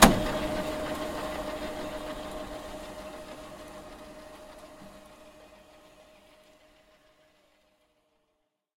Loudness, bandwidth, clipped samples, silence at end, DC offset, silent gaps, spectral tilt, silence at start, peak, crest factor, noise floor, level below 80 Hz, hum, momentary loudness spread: -33 LUFS; 16.5 kHz; under 0.1%; 2.75 s; under 0.1%; none; -3.5 dB/octave; 0 s; 0 dBFS; 32 dB; -78 dBFS; -44 dBFS; none; 22 LU